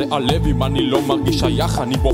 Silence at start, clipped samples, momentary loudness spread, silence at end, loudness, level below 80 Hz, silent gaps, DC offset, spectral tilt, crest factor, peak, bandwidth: 0 s; under 0.1%; 2 LU; 0 s; -18 LUFS; -26 dBFS; none; under 0.1%; -6 dB/octave; 16 dB; -2 dBFS; 16 kHz